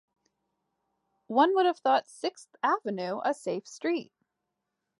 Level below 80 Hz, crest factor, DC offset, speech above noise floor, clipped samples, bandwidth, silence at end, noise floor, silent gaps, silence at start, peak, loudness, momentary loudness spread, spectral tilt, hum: -88 dBFS; 20 dB; under 0.1%; 56 dB; under 0.1%; 11.5 kHz; 0.95 s; -84 dBFS; none; 1.3 s; -10 dBFS; -29 LUFS; 11 LU; -4.5 dB/octave; none